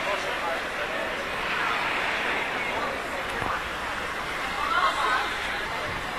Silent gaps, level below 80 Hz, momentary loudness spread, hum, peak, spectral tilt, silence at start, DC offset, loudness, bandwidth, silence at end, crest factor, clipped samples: none; -48 dBFS; 6 LU; none; -10 dBFS; -2.5 dB/octave; 0 s; under 0.1%; -27 LUFS; 14 kHz; 0 s; 18 dB; under 0.1%